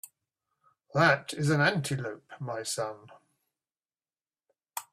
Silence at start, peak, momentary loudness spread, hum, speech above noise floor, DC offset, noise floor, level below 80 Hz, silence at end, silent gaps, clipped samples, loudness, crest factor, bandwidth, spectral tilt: 0.95 s; -8 dBFS; 17 LU; none; over 61 dB; under 0.1%; under -90 dBFS; -68 dBFS; 0.1 s; none; under 0.1%; -28 LUFS; 24 dB; 15 kHz; -4.5 dB/octave